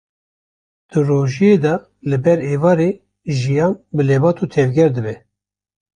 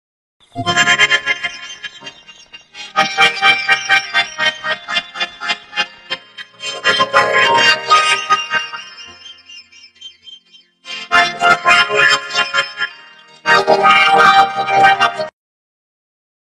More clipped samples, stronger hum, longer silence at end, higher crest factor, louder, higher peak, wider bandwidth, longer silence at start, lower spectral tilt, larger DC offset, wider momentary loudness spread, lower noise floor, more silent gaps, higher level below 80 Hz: neither; neither; second, 0.8 s vs 1.25 s; about the same, 14 dB vs 16 dB; second, -16 LUFS vs -12 LUFS; about the same, -2 dBFS vs 0 dBFS; second, 9.6 kHz vs 12.5 kHz; first, 0.95 s vs 0.55 s; first, -8 dB/octave vs -1.5 dB/octave; neither; second, 9 LU vs 19 LU; first, under -90 dBFS vs -47 dBFS; neither; about the same, -52 dBFS vs -56 dBFS